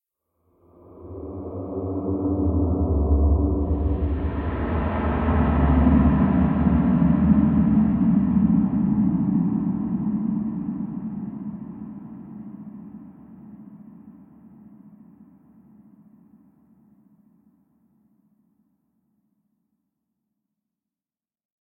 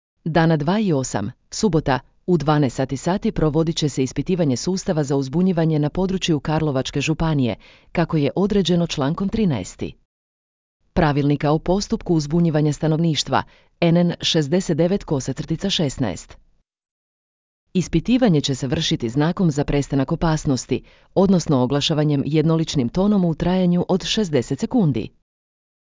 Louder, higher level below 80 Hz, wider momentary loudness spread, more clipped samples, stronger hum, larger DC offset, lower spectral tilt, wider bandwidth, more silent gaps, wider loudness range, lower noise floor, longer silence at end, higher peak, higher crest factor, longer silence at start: about the same, -22 LUFS vs -20 LUFS; first, -30 dBFS vs -40 dBFS; first, 21 LU vs 7 LU; neither; neither; neither; first, -13 dB/octave vs -6 dB/octave; second, 3.7 kHz vs 7.6 kHz; second, none vs 10.05-10.80 s, 16.91-17.67 s; first, 19 LU vs 3 LU; about the same, under -90 dBFS vs under -90 dBFS; first, 6.85 s vs 0.85 s; about the same, -6 dBFS vs -4 dBFS; about the same, 18 dB vs 16 dB; first, 0.95 s vs 0.25 s